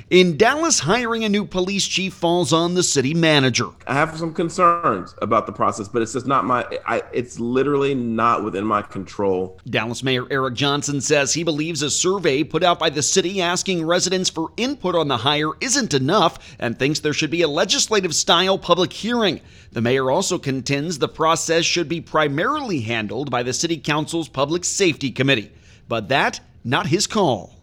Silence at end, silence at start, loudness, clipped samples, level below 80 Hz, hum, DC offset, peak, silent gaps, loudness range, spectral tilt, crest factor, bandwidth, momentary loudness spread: 0.15 s; 0.1 s; -19 LUFS; under 0.1%; -52 dBFS; none; under 0.1%; 0 dBFS; none; 3 LU; -3.5 dB/octave; 18 dB; 16.5 kHz; 7 LU